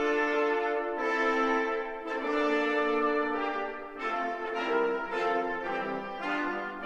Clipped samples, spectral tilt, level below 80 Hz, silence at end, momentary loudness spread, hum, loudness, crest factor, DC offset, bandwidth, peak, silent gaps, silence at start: under 0.1%; -4.5 dB/octave; -60 dBFS; 0 s; 7 LU; none; -30 LUFS; 14 dB; under 0.1%; 8.4 kHz; -16 dBFS; none; 0 s